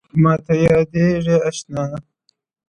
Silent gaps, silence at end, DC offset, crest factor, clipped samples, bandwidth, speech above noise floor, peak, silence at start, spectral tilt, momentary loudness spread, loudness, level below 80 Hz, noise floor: none; 0.7 s; under 0.1%; 16 dB; under 0.1%; 9.8 kHz; 50 dB; -2 dBFS; 0.15 s; -7.5 dB/octave; 10 LU; -17 LUFS; -46 dBFS; -66 dBFS